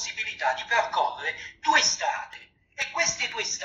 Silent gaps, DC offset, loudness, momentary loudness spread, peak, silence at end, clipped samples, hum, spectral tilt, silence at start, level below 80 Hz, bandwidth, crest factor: none; under 0.1%; -25 LUFS; 11 LU; -8 dBFS; 0 s; under 0.1%; none; 0.5 dB/octave; 0 s; -64 dBFS; 8.8 kHz; 20 dB